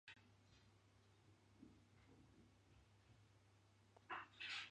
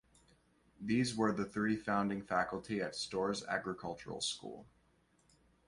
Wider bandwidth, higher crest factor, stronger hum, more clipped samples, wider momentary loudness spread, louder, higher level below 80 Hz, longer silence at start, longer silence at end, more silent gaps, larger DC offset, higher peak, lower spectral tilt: second, 9.4 kHz vs 11.5 kHz; first, 26 dB vs 20 dB; neither; neither; first, 18 LU vs 10 LU; second, -53 LUFS vs -37 LUFS; second, -82 dBFS vs -68 dBFS; second, 0.05 s vs 0.8 s; second, 0 s vs 1.05 s; neither; neither; second, -36 dBFS vs -18 dBFS; second, -2.5 dB/octave vs -4.5 dB/octave